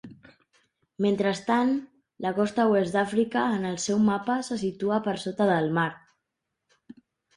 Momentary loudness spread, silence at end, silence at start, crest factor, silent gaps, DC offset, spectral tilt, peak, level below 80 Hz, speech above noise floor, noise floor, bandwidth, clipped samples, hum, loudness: 7 LU; 1.4 s; 0.05 s; 16 dB; none; under 0.1%; -5.5 dB/octave; -10 dBFS; -66 dBFS; 58 dB; -83 dBFS; 11 kHz; under 0.1%; none; -26 LUFS